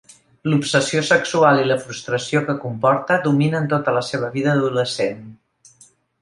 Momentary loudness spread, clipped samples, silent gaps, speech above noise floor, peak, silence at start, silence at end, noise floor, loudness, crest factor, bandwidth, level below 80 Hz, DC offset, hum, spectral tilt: 9 LU; under 0.1%; none; 35 dB; -2 dBFS; 0.45 s; 0.9 s; -53 dBFS; -19 LUFS; 18 dB; 11.5 kHz; -62 dBFS; under 0.1%; none; -5 dB/octave